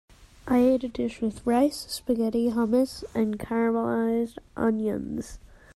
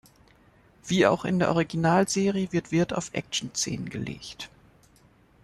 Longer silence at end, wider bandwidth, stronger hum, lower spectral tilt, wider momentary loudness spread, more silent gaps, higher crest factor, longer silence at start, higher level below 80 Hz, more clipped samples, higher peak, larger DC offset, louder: second, 0.3 s vs 1 s; about the same, 13 kHz vs 12.5 kHz; neither; about the same, -6 dB/octave vs -5 dB/octave; second, 10 LU vs 16 LU; neither; second, 14 dB vs 20 dB; second, 0.2 s vs 0.85 s; first, -52 dBFS vs -58 dBFS; neither; second, -12 dBFS vs -8 dBFS; neither; about the same, -26 LUFS vs -26 LUFS